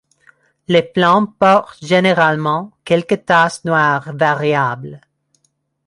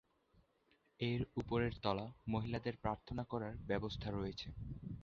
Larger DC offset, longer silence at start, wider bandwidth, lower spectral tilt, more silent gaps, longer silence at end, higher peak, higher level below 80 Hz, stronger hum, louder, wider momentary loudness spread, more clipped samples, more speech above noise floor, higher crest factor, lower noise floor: neither; second, 0.7 s vs 1 s; first, 11.5 kHz vs 7 kHz; about the same, -6 dB/octave vs -5.5 dB/octave; neither; first, 0.9 s vs 0 s; first, 0 dBFS vs -20 dBFS; about the same, -60 dBFS vs -58 dBFS; neither; first, -15 LUFS vs -42 LUFS; about the same, 6 LU vs 7 LU; neither; first, 51 dB vs 35 dB; second, 16 dB vs 22 dB; second, -65 dBFS vs -76 dBFS